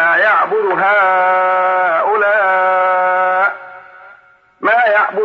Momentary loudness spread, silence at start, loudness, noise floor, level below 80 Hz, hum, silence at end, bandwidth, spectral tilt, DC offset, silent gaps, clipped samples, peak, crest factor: 4 LU; 0 s; -12 LUFS; -47 dBFS; -72 dBFS; none; 0 s; 6.2 kHz; -5.5 dB/octave; under 0.1%; none; under 0.1%; -4 dBFS; 10 dB